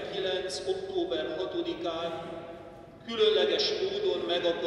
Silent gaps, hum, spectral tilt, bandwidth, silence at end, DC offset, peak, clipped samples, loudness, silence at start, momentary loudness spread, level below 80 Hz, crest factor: none; none; -3.5 dB/octave; 11.5 kHz; 0 s; under 0.1%; -14 dBFS; under 0.1%; -30 LUFS; 0 s; 17 LU; -62 dBFS; 18 dB